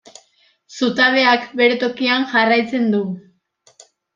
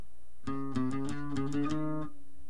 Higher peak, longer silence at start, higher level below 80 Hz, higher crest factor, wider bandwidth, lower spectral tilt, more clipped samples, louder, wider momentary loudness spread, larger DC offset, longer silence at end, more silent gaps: first, -2 dBFS vs -18 dBFS; first, 0.7 s vs 0.45 s; second, -68 dBFS vs -58 dBFS; about the same, 18 dB vs 16 dB; second, 7.6 kHz vs 10.5 kHz; second, -4.5 dB/octave vs -7 dB/octave; neither; first, -16 LUFS vs -36 LUFS; about the same, 10 LU vs 8 LU; second, under 0.1% vs 2%; first, 0.95 s vs 0.1 s; neither